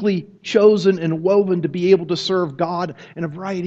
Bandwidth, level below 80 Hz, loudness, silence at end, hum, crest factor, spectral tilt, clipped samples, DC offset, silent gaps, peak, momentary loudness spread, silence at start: 7.8 kHz; -62 dBFS; -18 LUFS; 0 s; none; 18 dB; -6.5 dB/octave; under 0.1%; under 0.1%; none; -2 dBFS; 13 LU; 0 s